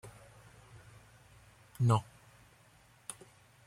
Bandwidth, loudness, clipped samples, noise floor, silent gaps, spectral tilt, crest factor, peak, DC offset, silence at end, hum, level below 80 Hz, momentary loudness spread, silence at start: 14 kHz; -34 LUFS; under 0.1%; -63 dBFS; none; -6.5 dB/octave; 22 dB; -16 dBFS; under 0.1%; 0.55 s; none; -66 dBFS; 28 LU; 0.05 s